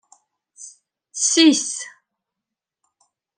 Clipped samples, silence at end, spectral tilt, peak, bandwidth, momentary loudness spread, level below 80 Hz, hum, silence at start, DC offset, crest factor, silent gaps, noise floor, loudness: under 0.1%; 1.5 s; -0.5 dB/octave; -2 dBFS; 10.5 kHz; 26 LU; -82 dBFS; none; 0.6 s; under 0.1%; 20 dB; none; -85 dBFS; -17 LUFS